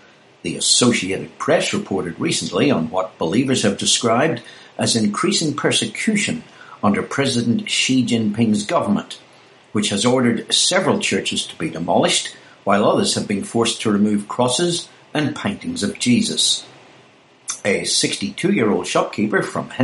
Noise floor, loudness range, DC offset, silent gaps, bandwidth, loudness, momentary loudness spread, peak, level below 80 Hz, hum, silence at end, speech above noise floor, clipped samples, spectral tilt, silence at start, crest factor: -50 dBFS; 2 LU; under 0.1%; none; 11.5 kHz; -18 LUFS; 9 LU; 0 dBFS; -60 dBFS; none; 0 s; 31 dB; under 0.1%; -3.5 dB/octave; 0.45 s; 18 dB